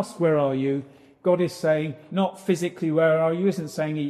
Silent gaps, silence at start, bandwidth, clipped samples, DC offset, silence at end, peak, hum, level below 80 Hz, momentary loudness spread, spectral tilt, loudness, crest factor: none; 0 s; 13.5 kHz; under 0.1%; under 0.1%; 0 s; -8 dBFS; none; -68 dBFS; 8 LU; -7 dB/octave; -24 LUFS; 16 dB